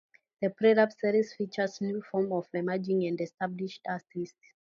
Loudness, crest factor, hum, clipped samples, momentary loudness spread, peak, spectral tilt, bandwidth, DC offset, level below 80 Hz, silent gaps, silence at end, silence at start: -30 LUFS; 20 dB; none; under 0.1%; 13 LU; -12 dBFS; -7 dB/octave; 7.2 kHz; under 0.1%; -80 dBFS; none; 0.4 s; 0.4 s